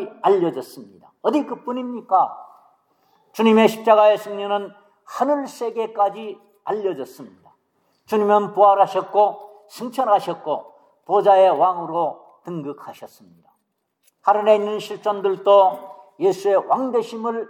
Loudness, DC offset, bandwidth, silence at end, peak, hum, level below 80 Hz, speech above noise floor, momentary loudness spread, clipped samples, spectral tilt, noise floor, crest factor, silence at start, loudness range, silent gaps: -19 LUFS; under 0.1%; 17 kHz; 0.05 s; -2 dBFS; none; -82 dBFS; 53 dB; 20 LU; under 0.1%; -5.5 dB/octave; -72 dBFS; 18 dB; 0 s; 5 LU; none